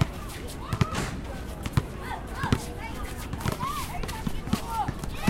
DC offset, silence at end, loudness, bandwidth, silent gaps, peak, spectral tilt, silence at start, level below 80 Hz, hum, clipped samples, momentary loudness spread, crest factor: under 0.1%; 0 s; -32 LUFS; 17 kHz; none; -6 dBFS; -5.5 dB/octave; 0 s; -38 dBFS; none; under 0.1%; 8 LU; 24 dB